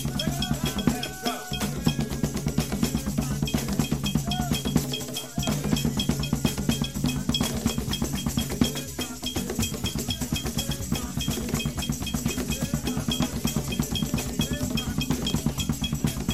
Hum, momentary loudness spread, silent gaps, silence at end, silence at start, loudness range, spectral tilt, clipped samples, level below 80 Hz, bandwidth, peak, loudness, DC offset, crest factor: none; 4 LU; none; 0 s; 0 s; 2 LU; -4.5 dB/octave; under 0.1%; -38 dBFS; 16 kHz; -6 dBFS; -27 LUFS; 0.4%; 22 dB